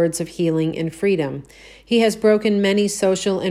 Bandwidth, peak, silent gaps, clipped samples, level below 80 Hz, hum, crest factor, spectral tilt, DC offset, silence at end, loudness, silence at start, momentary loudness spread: 14.5 kHz; -4 dBFS; none; under 0.1%; -54 dBFS; none; 16 dB; -5 dB/octave; under 0.1%; 0 s; -19 LUFS; 0 s; 6 LU